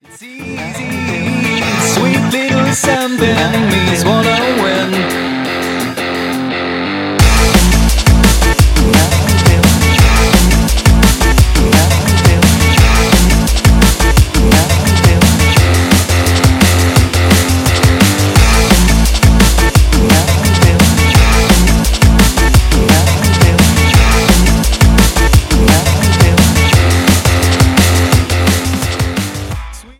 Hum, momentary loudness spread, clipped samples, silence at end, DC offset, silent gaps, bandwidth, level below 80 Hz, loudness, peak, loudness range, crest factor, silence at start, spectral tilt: none; 7 LU; 0.2%; 0.2 s; under 0.1%; none; 17 kHz; -14 dBFS; -10 LUFS; 0 dBFS; 4 LU; 10 dB; 0.2 s; -4.5 dB/octave